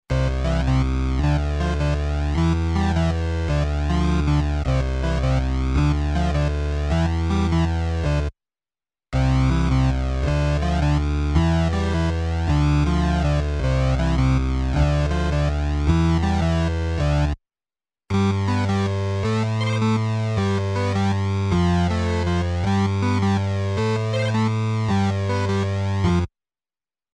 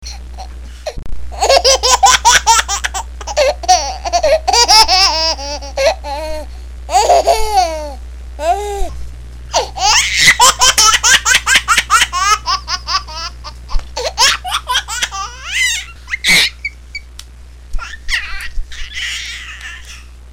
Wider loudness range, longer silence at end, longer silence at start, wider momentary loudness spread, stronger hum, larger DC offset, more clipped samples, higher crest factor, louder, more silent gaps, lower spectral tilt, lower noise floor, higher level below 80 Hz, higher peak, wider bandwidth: second, 2 LU vs 7 LU; first, 0.85 s vs 0 s; about the same, 0.1 s vs 0 s; second, 3 LU vs 22 LU; neither; second, under 0.1% vs 0.7%; neither; about the same, 14 dB vs 14 dB; second, -22 LUFS vs -11 LUFS; neither; first, -7 dB/octave vs 0 dB/octave; first, under -90 dBFS vs -35 dBFS; about the same, -26 dBFS vs -28 dBFS; second, -6 dBFS vs 0 dBFS; second, 9.8 kHz vs 18.5 kHz